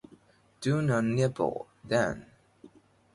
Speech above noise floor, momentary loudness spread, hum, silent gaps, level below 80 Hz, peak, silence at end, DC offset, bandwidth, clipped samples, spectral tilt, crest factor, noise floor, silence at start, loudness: 32 dB; 10 LU; none; none; -62 dBFS; -14 dBFS; 0.5 s; under 0.1%; 11.5 kHz; under 0.1%; -6.5 dB/octave; 18 dB; -60 dBFS; 0.6 s; -29 LUFS